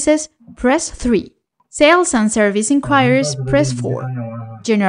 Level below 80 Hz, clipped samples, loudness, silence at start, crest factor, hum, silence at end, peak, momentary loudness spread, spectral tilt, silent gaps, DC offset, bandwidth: -40 dBFS; under 0.1%; -15 LUFS; 0 s; 16 dB; none; 0 s; 0 dBFS; 14 LU; -4.5 dB/octave; none; under 0.1%; 10.5 kHz